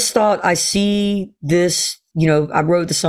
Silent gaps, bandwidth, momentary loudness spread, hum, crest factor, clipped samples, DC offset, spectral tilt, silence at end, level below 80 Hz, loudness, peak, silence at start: none; 16 kHz; 5 LU; none; 16 dB; under 0.1%; under 0.1%; -4 dB/octave; 0 s; -48 dBFS; -17 LUFS; -2 dBFS; 0 s